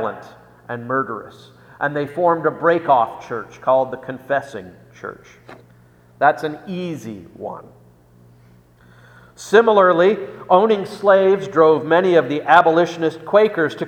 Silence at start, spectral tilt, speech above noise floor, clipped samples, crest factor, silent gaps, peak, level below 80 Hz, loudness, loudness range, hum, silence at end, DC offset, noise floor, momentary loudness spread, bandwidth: 0 s; -6 dB/octave; 32 dB; under 0.1%; 18 dB; none; 0 dBFS; -62 dBFS; -17 LUFS; 11 LU; 60 Hz at -50 dBFS; 0 s; under 0.1%; -50 dBFS; 19 LU; 12.5 kHz